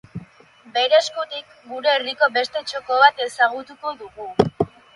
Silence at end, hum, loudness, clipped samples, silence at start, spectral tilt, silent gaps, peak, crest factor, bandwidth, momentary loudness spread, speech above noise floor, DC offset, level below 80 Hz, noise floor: 0.3 s; none; -20 LUFS; under 0.1%; 0.15 s; -4 dB/octave; none; 0 dBFS; 22 dB; 11.5 kHz; 17 LU; 29 dB; under 0.1%; -56 dBFS; -49 dBFS